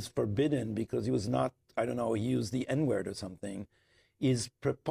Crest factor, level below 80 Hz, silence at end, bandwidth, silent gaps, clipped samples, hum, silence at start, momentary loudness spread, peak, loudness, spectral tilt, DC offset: 16 dB; -62 dBFS; 0 s; 15 kHz; none; under 0.1%; none; 0 s; 10 LU; -18 dBFS; -33 LUFS; -6.5 dB/octave; under 0.1%